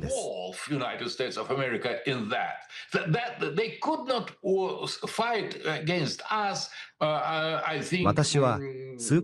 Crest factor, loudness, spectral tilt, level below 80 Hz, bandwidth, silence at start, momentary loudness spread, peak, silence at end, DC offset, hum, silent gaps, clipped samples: 20 dB; -29 LUFS; -4.5 dB/octave; -60 dBFS; 12.5 kHz; 0 s; 8 LU; -8 dBFS; 0 s; under 0.1%; none; none; under 0.1%